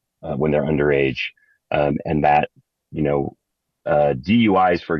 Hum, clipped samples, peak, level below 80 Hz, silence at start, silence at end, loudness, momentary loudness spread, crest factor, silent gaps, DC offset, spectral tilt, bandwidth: none; under 0.1%; -4 dBFS; -44 dBFS; 0.25 s; 0 s; -20 LUFS; 13 LU; 16 dB; none; under 0.1%; -8.5 dB/octave; 6.2 kHz